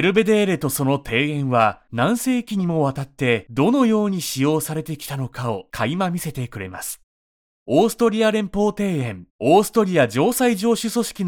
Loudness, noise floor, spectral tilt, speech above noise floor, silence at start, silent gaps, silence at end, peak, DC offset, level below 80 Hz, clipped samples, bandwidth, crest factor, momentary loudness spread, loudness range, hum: -20 LUFS; under -90 dBFS; -5.5 dB/octave; over 70 dB; 0 s; 7.03-7.66 s, 9.30-9.39 s; 0 s; -2 dBFS; under 0.1%; -52 dBFS; under 0.1%; 19.5 kHz; 18 dB; 11 LU; 6 LU; none